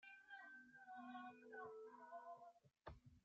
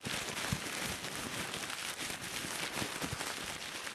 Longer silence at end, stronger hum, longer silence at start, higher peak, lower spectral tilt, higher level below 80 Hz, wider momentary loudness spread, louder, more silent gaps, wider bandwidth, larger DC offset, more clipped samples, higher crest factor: about the same, 0.05 s vs 0 s; neither; about the same, 0 s vs 0 s; second, -40 dBFS vs -18 dBFS; first, -3.5 dB/octave vs -2 dB/octave; second, -78 dBFS vs -60 dBFS; first, 7 LU vs 2 LU; second, -60 LUFS vs -38 LUFS; neither; second, 7.4 kHz vs 17.5 kHz; neither; neither; about the same, 20 dB vs 22 dB